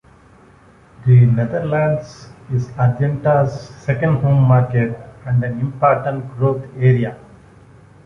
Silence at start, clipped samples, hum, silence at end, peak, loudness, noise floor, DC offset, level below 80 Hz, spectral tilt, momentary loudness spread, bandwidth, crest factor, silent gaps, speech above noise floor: 1 s; under 0.1%; none; 0.9 s; -2 dBFS; -17 LUFS; -47 dBFS; under 0.1%; -46 dBFS; -9.5 dB/octave; 11 LU; 6.4 kHz; 16 dB; none; 31 dB